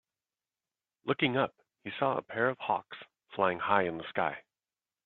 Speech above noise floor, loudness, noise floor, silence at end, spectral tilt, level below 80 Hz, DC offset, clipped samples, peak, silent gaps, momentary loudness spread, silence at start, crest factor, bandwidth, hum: over 59 dB; -32 LUFS; under -90 dBFS; 0.65 s; -8.5 dB/octave; -74 dBFS; under 0.1%; under 0.1%; -8 dBFS; none; 17 LU; 1.05 s; 24 dB; 4.3 kHz; none